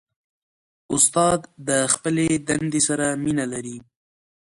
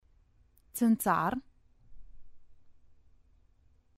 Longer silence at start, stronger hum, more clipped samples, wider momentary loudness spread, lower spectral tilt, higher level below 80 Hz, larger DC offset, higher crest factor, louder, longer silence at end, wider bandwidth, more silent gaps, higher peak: first, 0.9 s vs 0.75 s; neither; neither; second, 11 LU vs 14 LU; second, -3.5 dB/octave vs -5.5 dB/octave; first, -54 dBFS vs -60 dBFS; neither; about the same, 22 dB vs 20 dB; first, -21 LUFS vs -30 LUFS; second, 0.7 s vs 1.05 s; second, 11.5 kHz vs 16 kHz; neither; first, -2 dBFS vs -14 dBFS